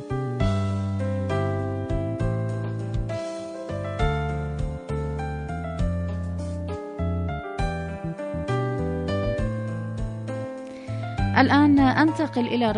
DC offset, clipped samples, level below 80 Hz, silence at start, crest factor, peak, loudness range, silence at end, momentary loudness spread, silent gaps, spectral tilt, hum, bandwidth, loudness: under 0.1%; under 0.1%; -36 dBFS; 0 s; 20 dB; -4 dBFS; 7 LU; 0 s; 12 LU; none; -7.5 dB/octave; none; 10 kHz; -26 LUFS